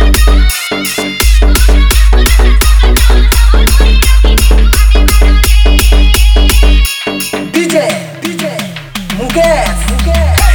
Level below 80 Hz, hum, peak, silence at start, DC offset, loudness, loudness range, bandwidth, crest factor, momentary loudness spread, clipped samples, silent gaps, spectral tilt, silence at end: -8 dBFS; none; 0 dBFS; 0 s; under 0.1%; -9 LUFS; 4 LU; over 20 kHz; 6 dB; 8 LU; 1%; none; -4.5 dB/octave; 0 s